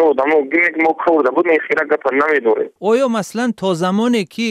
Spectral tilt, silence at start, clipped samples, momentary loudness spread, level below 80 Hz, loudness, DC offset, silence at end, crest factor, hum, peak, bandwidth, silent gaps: -5.5 dB/octave; 0 s; under 0.1%; 5 LU; -66 dBFS; -15 LUFS; under 0.1%; 0 s; 12 dB; none; -2 dBFS; 14 kHz; none